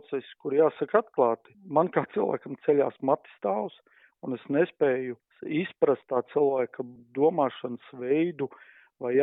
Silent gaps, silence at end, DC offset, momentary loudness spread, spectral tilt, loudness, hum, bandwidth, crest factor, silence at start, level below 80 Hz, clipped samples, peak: none; 0 s; under 0.1%; 12 LU; -5.5 dB/octave; -28 LUFS; none; 4 kHz; 20 dB; 0.1 s; -80 dBFS; under 0.1%; -8 dBFS